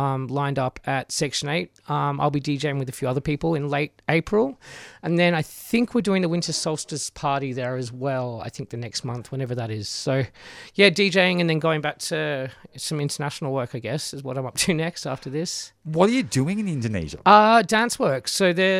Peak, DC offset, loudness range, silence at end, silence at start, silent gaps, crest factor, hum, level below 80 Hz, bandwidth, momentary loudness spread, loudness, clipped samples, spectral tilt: -2 dBFS; under 0.1%; 7 LU; 0 s; 0 s; none; 22 dB; none; -54 dBFS; 16 kHz; 12 LU; -23 LUFS; under 0.1%; -4.5 dB/octave